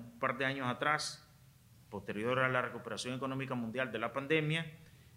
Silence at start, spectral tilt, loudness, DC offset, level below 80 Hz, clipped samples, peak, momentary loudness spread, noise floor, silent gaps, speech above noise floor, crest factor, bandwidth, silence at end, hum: 0 s; -5 dB/octave; -36 LUFS; under 0.1%; -72 dBFS; under 0.1%; -16 dBFS; 10 LU; -62 dBFS; none; 26 dB; 20 dB; 16 kHz; 0 s; none